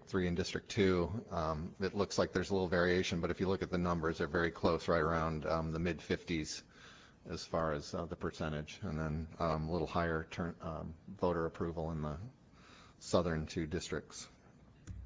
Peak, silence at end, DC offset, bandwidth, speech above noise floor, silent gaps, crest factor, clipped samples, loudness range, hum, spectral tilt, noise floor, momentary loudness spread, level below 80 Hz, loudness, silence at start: -16 dBFS; 0 s; under 0.1%; 8 kHz; 25 dB; none; 22 dB; under 0.1%; 6 LU; none; -6 dB/octave; -61 dBFS; 13 LU; -52 dBFS; -37 LUFS; 0 s